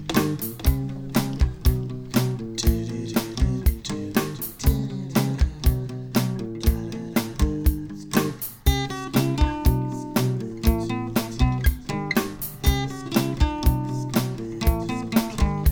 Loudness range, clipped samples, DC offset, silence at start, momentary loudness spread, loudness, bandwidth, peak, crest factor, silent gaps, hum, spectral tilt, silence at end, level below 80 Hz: 1 LU; under 0.1%; under 0.1%; 0 s; 4 LU; -25 LUFS; over 20 kHz; -4 dBFS; 18 dB; none; none; -6 dB/octave; 0 s; -26 dBFS